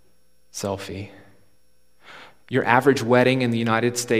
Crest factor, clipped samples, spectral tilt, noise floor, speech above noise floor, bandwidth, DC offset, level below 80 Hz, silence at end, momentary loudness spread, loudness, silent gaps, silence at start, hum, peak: 22 dB; under 0.1%; -5 dB/octave; -66 dBFS; 45 dB; 15.5 kHz; 0.3%; -64 dBFS; 0 s; 18 LU; -21 LUFS; none; 0.55 s; none; -2 dBFS